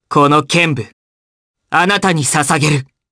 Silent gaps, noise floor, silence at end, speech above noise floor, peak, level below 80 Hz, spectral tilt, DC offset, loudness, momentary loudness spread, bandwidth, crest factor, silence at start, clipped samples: 0.93-1.54 s; under -90 dBFS; 0.3 s; over 77 dB; 0 dBFS; -52 dBFS; -4 dB/octave; under 0.1%; -13 LUFS; 8 LU; 11 kHz; 14 dB; 0.1 s; under 0.1%